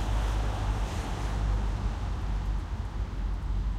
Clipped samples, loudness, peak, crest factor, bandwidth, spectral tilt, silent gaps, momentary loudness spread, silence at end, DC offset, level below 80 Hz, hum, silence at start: under 0.1%; -33 LUFS; -18 dBFS; 12 dB; 10 kHz; -6 dB/octave; none; 4 LU; 0 s; under 0.1%; -30 dBFS; none; 0 s